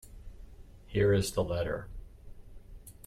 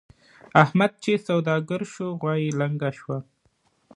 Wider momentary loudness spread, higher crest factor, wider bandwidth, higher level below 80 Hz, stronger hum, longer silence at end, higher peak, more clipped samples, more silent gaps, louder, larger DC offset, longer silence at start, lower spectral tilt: first, 26 LU vs 12 LU; second, 18 dB vs 24 dB; first, 16 kHz vs 10.5 kHz; first, -48 dBFS vs -68 dBFS; neither; second, 0 s vs 0.75 s; second, -16 dBFS vs 0 dBFS; neither; neither; second, -31 LUFS vs -24 LUFS; neither; second, 0.05 s vs 0.55 s; about the same, -6 dB/octave vs -7 dB/octave